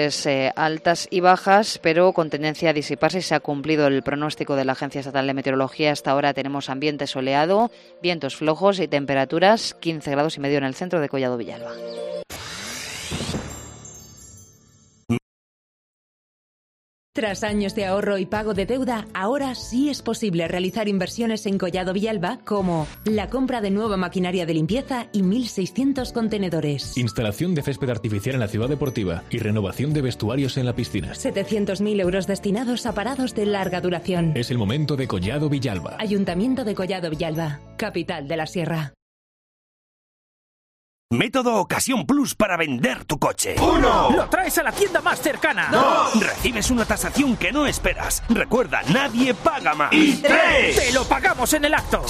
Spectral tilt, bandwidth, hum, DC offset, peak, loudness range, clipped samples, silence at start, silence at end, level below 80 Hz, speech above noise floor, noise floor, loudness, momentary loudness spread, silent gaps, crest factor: -4.5 dB/octave; 15 kHz; none; under 0.1%; -2 dBFS; 10 LU; under 0.1%; 0 s; 0 s; -42 dBFS; 33 dB; -55 dBFS; -22 LUFS; 9 LU; 15.22-17.13 s, 39.02-41.09 s; 20 dB